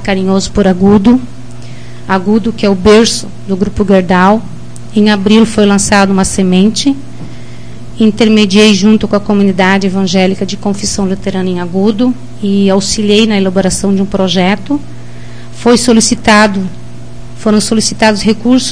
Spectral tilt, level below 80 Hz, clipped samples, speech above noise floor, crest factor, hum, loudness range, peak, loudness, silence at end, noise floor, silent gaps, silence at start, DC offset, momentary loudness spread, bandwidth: -4.5 dB/octave; -32 dBFS; 2%; 20 dB; 10 dB; none; 2 LU; 0 dBFS; -9 LUFS; 0 s; -28 dBFS; none; 0 s; 7%; 22 LU; 10.5 kHz